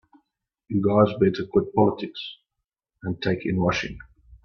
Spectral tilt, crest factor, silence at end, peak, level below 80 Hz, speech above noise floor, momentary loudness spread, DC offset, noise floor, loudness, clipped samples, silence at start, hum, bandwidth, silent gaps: -7 dB/octave; 18 dB; 0.1 s; -6 dBFS; -52 dBFS; 61 dB; 16 LU; under 0.1%; -84 dBFS; -23 LUFS; under 0.1%; 0.7 s; none; 6.8 kHz; none